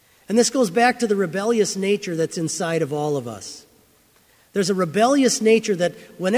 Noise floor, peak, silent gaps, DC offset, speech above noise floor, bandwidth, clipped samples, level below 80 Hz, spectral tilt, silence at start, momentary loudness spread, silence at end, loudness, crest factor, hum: -57 dBFS; -4 dBFS; none; under 0.1%; 37 dB; 16 kHz; under 0.1%; -66 dBFS; -4 dB/octave; 0.3 s; 10 LU; 0 s; -20 LUFS; 18 dB; none